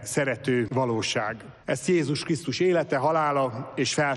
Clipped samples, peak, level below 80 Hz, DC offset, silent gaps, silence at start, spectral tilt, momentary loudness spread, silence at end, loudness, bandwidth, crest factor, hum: under 0.1%; -12 dBFS; -62 dBFS; under 0.1%; none; 0 s; -5 dB/octave; 6 LU; 0 s; -26 LUFS; 12.5 kHz; 14 dB; none